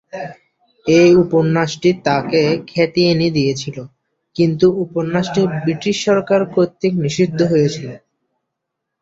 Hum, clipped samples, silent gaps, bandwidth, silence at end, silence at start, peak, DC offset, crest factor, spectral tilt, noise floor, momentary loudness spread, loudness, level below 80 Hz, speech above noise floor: none; under 0.1%; none; 7.8 kHz; 1.05 s; 0.15 s; -2 dBFS; under 0.1%; 14 dB; -6 dB/octave; -78 dBFS; 15 LU; -16 LUFS; -52 dBFS; 63 dB